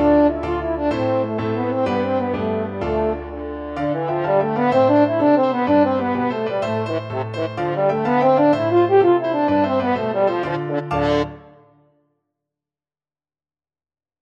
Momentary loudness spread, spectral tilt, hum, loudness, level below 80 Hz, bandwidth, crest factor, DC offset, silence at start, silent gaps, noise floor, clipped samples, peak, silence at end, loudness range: 9 LU; -8 dB/octave; none; -19 LUFS; -44 dBFS; 7.4 kHz; 14 dB; under 0.1%; 0 s; none; under -90 dBFS; under 0.1%; -4 dBFS; 2.8 s; 7 LU